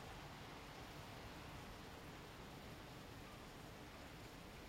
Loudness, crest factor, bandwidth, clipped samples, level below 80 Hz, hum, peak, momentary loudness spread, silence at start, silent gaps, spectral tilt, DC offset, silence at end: -55 LUFS; 14 dB; 16 kHz; under 0.1%; -64 dBFS; none; -42 dBFS; 2 LU; 0 s; none; -4.5 dB/octave; under 0.1%; 0 s